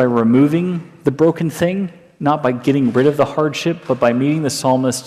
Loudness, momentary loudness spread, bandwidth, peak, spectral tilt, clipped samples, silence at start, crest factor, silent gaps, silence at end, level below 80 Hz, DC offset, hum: -16 LUFS; 8 LU; 15 kHz; -2 dBFS; -6 dB/octave; under 0.1%; 0 s; 12 dB; none; 0 s; -56 dBFS; under 0.1%; none